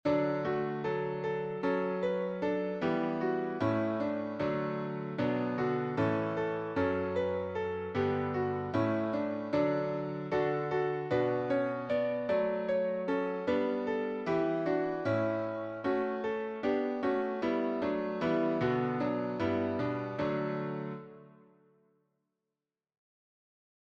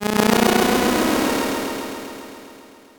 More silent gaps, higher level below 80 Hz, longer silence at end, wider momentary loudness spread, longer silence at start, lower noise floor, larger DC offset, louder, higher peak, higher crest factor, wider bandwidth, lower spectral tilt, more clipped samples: neither; second, -66 dBFS vs -46 dBFS; first, 2.65 s vs 0.35 s; second, 4 LU vs 20 LU; about the same, 0.05 s vs 0 s; first, under -90 dBFS vs -44 dBFS; neither; second, -33 LUFS vs -19 LUFS; second, -18 dBFS vs -2 dBFS; about the same, 16 dB vs 18 dB; second, 7.2 kHz vs 19.5 kHz; first, -8.5 dB/octave vs -4 dB/octave; neither